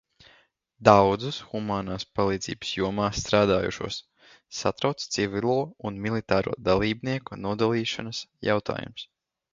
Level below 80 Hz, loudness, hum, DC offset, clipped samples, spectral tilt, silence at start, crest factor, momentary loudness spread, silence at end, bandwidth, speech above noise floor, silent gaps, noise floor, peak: -50 dBFS; -26 LUFS; none; under 0.1%; under 0.1%; -5 dB/octave; 0.8 s; 26 dB; 12 LU; 0.5 s; 9 kHz; 36 dB; none; -62 dBFS; 0 dBFS